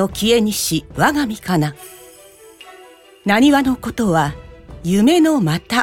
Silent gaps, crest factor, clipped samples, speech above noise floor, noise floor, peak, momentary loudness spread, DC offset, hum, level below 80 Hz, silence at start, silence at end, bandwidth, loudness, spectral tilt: none; 16 dB; under 0.1%; 28 dB; -44 dBFS; 0 dBFS; 13 LU; under 0.1%; none; -42 dBFS; 0 s; 0 s; 18 kHz; -16 LUFS; -5 dB/octave